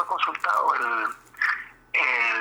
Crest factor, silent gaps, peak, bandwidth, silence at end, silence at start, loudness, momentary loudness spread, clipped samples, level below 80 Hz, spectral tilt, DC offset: 16 dB; none; -10 dBFS; over 20 kHz; 0 s; 0 s; -24 LUFS; 7 LU; under 0.1%; -68 dBFS; -1 dB/octave; under 0.1%